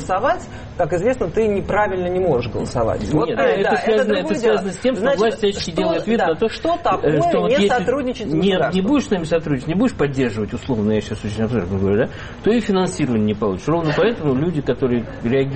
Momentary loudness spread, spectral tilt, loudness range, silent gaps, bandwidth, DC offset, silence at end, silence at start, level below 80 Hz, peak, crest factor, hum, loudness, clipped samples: 5 LU; -6.5 dB/octave; 2 LU; none; 8.8 kHz; under 0.1%; 0 s; 0 s; -40 dBFS; -6 dBFS; 12 dB; none; -19 LUFS; under 0.1%